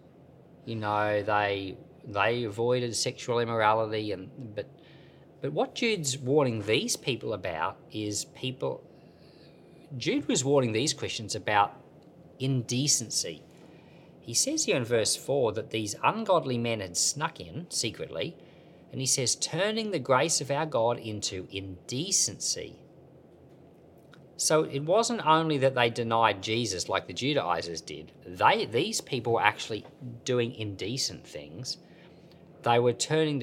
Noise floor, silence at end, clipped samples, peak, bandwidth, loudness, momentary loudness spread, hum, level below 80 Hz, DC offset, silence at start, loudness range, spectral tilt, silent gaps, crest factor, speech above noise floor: -54 dBFS; 0 s; under 0.1%; -4 dBFS; 16.5 kHz; -28 LUFS; 13 LU; none; -68 dBFS; under 0.1%; 0.65 s; 4 LU; -3.5 dB/octave; none; 26 dB; 26 dB